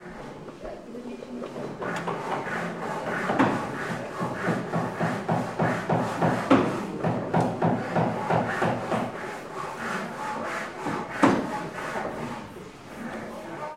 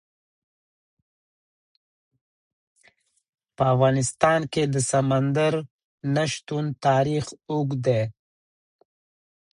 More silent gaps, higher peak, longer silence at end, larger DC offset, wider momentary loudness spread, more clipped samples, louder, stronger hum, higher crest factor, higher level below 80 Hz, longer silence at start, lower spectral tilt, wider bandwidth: second, none vs 5.71-5.98 s; about the same, -4 dBFS vs -4 dBFS; second, 0 s vs 1.45 s; neither; first, 15 LU vs 9 LU; neither; second, -28 LUFS vs -23 LUFS; neither; about the same, 24 dB vs 22 dB; about the same, -58 dBFS vs -58 dBFS; second, 0 s vs 3.6 s; about the same, -6.5 dB/octave vs -5.5 dB/octave; first, 15.5 kHz vs 11 kHz